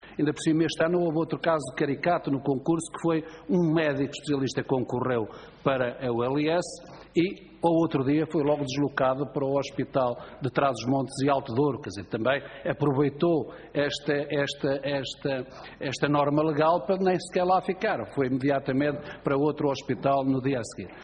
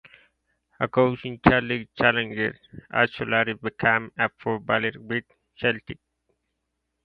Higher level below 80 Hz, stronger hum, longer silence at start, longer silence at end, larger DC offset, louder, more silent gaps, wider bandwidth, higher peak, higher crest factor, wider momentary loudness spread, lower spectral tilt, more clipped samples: second, -60 dBFS vs -52 dBFS; neither; second, 0.05 s vs 0.8 s; second, 0 s vs 1.1 s; neither; second, -27 LUFS vs -24 LUFS; neither; first, 9.4 kHz vs 5.4 kHz; second, -8 dBFS vs 0 dBFS; second, 18 dB vs 26 dB; second, 6 LU vs 10 LU; second, -6 dB/octave vs -8.5 dB/octave; neither